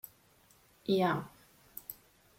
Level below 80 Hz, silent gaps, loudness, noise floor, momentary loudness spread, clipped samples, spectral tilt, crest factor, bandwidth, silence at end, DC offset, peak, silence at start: -72 dBFS; none; -34 LUFS; -65 dBFS; 22 LU; under 0.1%; -6 dB/octave; 20 dB; 16.5 kHz; 0.45 s; under 0.1%; -16 dBFS; 0.9 s